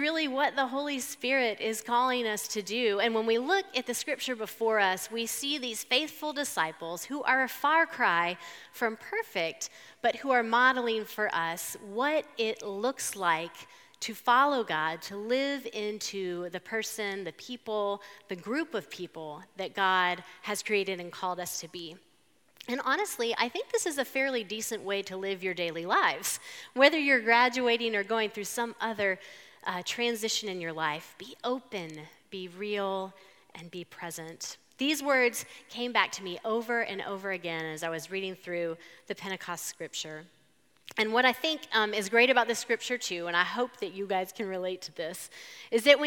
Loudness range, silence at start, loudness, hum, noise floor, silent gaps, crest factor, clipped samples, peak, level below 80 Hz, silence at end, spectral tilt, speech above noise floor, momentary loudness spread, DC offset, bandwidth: 8 LU; 0 s; -30 LUFS; none; -68 dBFS; none; 26 dB; under 0.1%; -6 dBFS; -86 dBFS; 0 s; -2.5 dB/octave; 37 dB; 15 LU; under 0.1%; 19 kHz